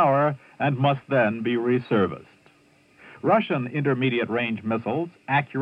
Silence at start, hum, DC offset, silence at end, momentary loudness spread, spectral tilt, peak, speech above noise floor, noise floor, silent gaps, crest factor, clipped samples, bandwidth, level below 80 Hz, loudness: 0 s; none; under 0.1%; 0 s; 6 LU; -9 dB/octave; -8 dBFS; 35 dB; -58 dBFS; none; 16 dB; under 0.1%; 5.4 kHz; -70 dBFS; -24 LUFS